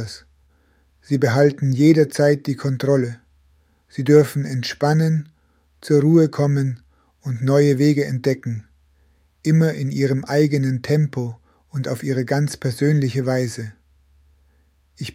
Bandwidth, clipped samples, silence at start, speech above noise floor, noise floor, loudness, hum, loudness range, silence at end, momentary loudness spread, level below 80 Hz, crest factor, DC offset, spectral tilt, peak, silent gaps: 15.5 kHz; under 0.1%; 0 s; 42 dB; -60 dBFS; -19 LUFS; none; 4 LU; 0.05 s; 15 LU; -58 dBFS; 18 dB; under 0.1%; -7 dB/octave; -2 dBFS; none